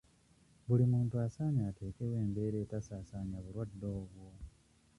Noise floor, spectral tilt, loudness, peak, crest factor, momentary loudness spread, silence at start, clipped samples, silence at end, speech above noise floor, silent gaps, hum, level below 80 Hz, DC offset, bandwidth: -67 dBFS; -10 dB/octave; -37 LUFS; -20 dBFS; 18 dB; 21 LU; 0.65 s; under 0.1%; 0.5 s; 32 dB; none; none; -58 dBFS; under 0.1%; 11 kHz